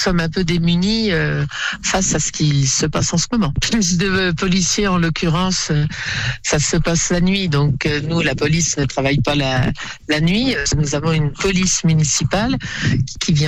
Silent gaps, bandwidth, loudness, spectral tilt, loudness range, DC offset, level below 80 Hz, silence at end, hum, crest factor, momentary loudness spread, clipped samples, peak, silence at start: none; 11 kHz; -17 LUFS; -4 dB/octave; 1 LU; under 0.1%; -32 dBFS; 0 s; none; 12 dB; 4 LU; under 0.1%; -6 dBFS; 0 s